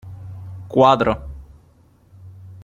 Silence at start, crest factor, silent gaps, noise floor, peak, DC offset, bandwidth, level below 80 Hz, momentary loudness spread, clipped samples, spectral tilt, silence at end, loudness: 0.05 s; 20 dB; none; -53 dBFS; -2 dBFS; under 0.1%; 10.5 kHz; -42 dBFS; 26 LU; under 0.1%; -7 dB/octave; 0.1 s; -17 LUFS